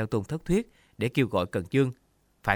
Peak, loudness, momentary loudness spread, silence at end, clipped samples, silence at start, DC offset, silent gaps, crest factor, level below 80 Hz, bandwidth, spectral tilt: -6 dBFS; -28 LUFS; 7 LU; 0 s; under 0.1%; 0 s; under 0.1%; none; 22 dB; -50 dBFS; 18 kHz; -7 dB/octave